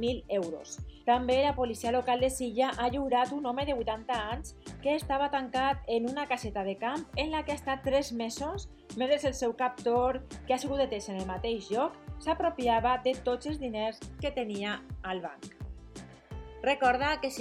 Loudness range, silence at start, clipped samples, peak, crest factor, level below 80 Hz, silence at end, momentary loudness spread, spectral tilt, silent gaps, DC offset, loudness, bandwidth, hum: 4 LU; 0 s; under 0.1%; -14 dBFS; 18 dB; -48 dBFS; 0 s; 11 LU; -4.5 dB/octave; none; under 0.1%; -31 LUFS; 15.5 kHz; none